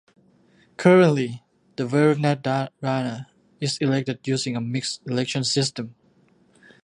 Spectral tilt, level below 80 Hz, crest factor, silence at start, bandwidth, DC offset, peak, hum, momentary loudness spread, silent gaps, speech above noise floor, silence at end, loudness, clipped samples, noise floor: -5.5 dB/octave; -68 dBFS; 22 dB; 0.8 s; 11 kHz; under 0.1%; -2 dBFS; none; 14 LU; none; 38 dB; 0.95 s; -22 LUFS; under 0.1%; -59 dBFS